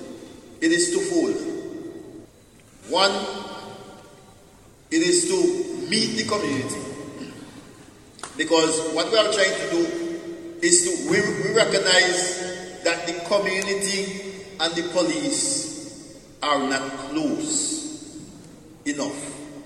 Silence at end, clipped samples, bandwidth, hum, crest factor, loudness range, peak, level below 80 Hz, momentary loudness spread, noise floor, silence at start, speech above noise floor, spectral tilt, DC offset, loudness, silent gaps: 0 s; under 0.1%; 12.5 kHz; none; 24 dB; 6 LU; 0 dBFS; -60 dBFS; 20 LU; -51 dBFS; 0 s; 29 dB; -2.5 dB/octave; under 0.1%; -22 LUFS; none